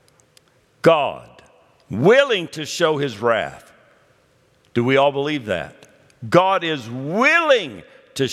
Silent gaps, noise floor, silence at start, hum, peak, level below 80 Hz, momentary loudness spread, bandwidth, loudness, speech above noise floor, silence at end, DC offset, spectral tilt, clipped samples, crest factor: none; -58 dBFS; 0.85 s; none; 0 dBFS; -64 dBFS; 16 LU; 14.5 kHz; -18 LUFS; 40 dB; 0 s; under 0.1%; -5 dB/octave; under 0.1%; 20 dB